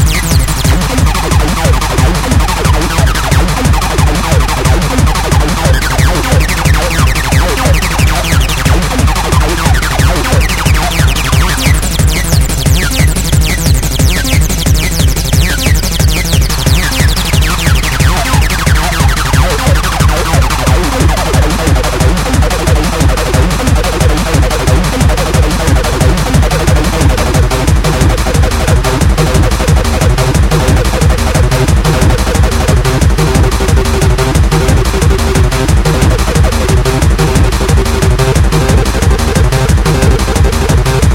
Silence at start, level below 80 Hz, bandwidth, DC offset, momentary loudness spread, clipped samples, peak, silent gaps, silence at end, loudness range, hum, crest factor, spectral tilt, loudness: 0 s; -12 dBFS; 17 kHz; under 0.1%; 1 LU; 0.6%; 0 dBFS; none; 0 s; 1 LU; none; 8 dB; -4.5 dB/octave; -10 LUFS